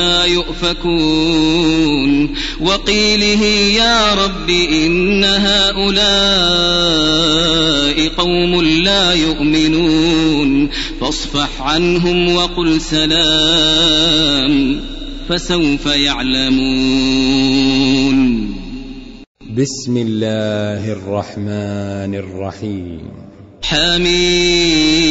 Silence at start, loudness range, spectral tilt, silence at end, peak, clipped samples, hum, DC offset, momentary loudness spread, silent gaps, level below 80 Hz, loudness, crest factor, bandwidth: 0 s; 8 LU; -4 dB/octave; 0 s; -2 dBFS; under 0.1%; none; under 0.1%; 12 LU; 19.27-19.35 s; -28 dBFS; -13 LUFS; 12 dB; 8 kHz